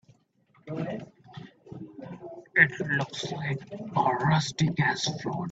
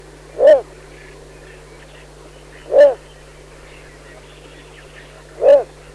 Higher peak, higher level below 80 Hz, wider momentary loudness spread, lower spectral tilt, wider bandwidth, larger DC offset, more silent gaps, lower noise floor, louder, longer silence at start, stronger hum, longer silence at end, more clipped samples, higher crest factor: about the same, -4 dBFS vs -2 dBFS; second, -62 dBFS vs -46 dBFS; first, 23 LU vs 20 LU; about the same, -5 dB/octave vs -4.5 dB/octave; second, 8 kHz vs 11 kHz; neither; neither; first, -65 dBFS vs -41 dBFS; second, -27 LUFS vs -13 LUFS; first, 0.65 s vs 0.35 s; neither; second, 0 s vs 0.3 s; neither; first, 24 dB vs 16 dB